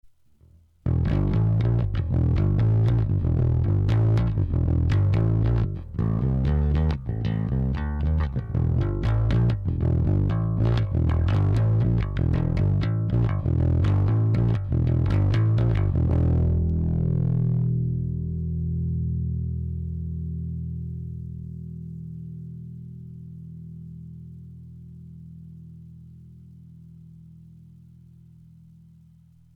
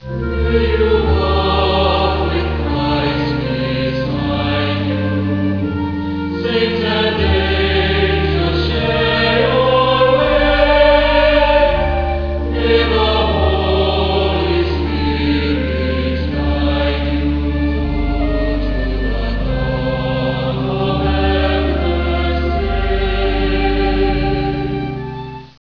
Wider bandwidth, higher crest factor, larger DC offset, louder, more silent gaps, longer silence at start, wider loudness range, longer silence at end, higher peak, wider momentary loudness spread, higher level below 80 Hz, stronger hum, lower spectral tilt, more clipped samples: about the same, 5.4 kHz vs 5.4 kHz; second, 8 dB vs 16 dB; second, under 0.1% vs 0.3%; second, -24 LUFS vs -16 LUFS; neither; first, 0.85 s vs 0 s; first, 18 LU vs 5 LU; first, 2.3 s vs 0.2 s; second, -16 dBFS vs 0 dBFS; first, 19 LU vs 7 LU; second, -32 dBFS vs -22 dBFS; neither; first, -10 dB/octave vs -8 dB/octave; neither